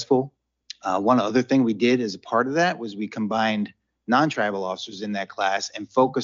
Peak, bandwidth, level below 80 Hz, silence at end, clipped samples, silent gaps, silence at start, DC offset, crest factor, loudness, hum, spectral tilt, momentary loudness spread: -6 dBFS; 7.4 kHz; -72 dBFS; 0 s; under 0.1%; none; 0 s; under 0.1%; 16 dB; -23 LUFS; none; -5 dB/octave; 11 LU